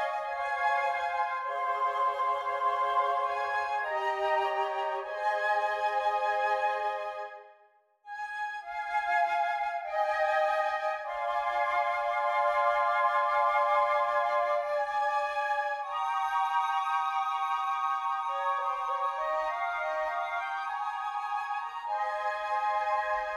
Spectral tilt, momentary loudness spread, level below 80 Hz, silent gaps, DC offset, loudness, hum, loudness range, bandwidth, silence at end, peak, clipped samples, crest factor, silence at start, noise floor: -1 dB/octave; 7 LU; -70 dBFS; none; under 0.1%; -30 LUFS; none; 5 LU; 12 kHz; 0 s; -16 dBFS; under 0.1%; 14 dB; 0 s; -64 dBFS